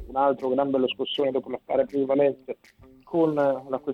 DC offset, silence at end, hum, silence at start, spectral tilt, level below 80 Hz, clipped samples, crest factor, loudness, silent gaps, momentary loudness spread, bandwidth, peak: under 0.1%; 0 s; none; 0 s; -7.5 dB/octave; -58 dBFS; under 0.1%; 16 dB; -25 LUFS; none; 8 LU; 5.6 kHz; -8 dBFS